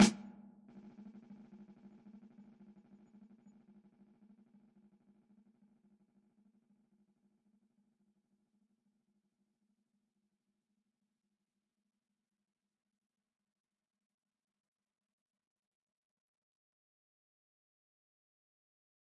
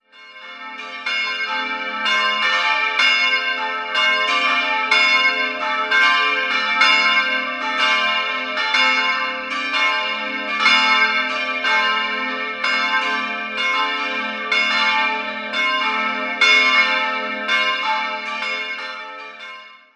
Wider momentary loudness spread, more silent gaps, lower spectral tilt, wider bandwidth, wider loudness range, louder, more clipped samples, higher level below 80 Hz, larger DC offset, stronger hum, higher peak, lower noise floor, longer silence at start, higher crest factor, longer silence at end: about the same, 10 LU vs 10 LU; neither; first, -4.5 dB/octave vs -0.5 dB/octave; second, 6.8 kHz vs 11.5 kHz; first, 10 LU vs 3 LU; second, -37 LUFS vs -17 LUFS; neither; second, -76 dBFS vs -70 dBFS; neither; neither; second, -14 dBFS vs -2 dBFS; first, under -90 dBFS vs -40 dBFS; second, 0 s vs 0.15 s; first, 32 dB vs 18 dB; first, 19.05 s vs 0.2 s